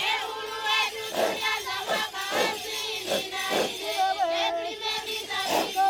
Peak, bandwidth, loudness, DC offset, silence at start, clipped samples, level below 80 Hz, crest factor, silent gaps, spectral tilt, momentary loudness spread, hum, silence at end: -12 dBFS; 19.5 kHz; -27 LUFS; under 0.1%; 0 s; under 0.1%; -64 dBFS; 16 dB; none; -1 dB/octave; 5 LU; none; 0 s